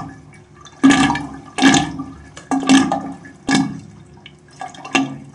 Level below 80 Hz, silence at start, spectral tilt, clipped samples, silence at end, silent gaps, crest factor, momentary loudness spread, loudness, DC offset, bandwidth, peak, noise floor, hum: -46 dBFS; 0 s; -3.5 dB/octave; under 0.1%; 0.05 s; none; 18 dB; 21 LU; -16 LUFS; under 0.1%; 11 kHz; 0 dBFS; -43 dBFS; none